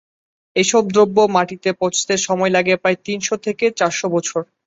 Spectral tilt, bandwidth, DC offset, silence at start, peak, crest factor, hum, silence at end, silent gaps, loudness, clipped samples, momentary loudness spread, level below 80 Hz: -3.5 dB/octave; 8 kHz; under 0.1%; 0.55 s; -2 dBFS; 16 dB; none; 0.25 s; none; -17 LUFS; under 0.1%; 7 LU; -60 dBFS